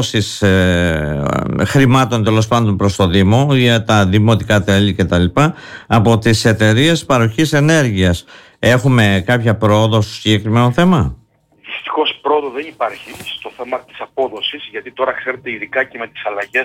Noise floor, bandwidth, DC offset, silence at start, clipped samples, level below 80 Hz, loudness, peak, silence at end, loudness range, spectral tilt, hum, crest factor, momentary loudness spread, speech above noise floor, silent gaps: -42 dBFS; 16 kHz; under 0.1%; 0 s; under 0.1%; -38 dBFS; -14 LUFS; -2 dBFS; 0 s; 8 LU; -6 dB/octave; none; 12 dB; 12 LU; 28 dB; none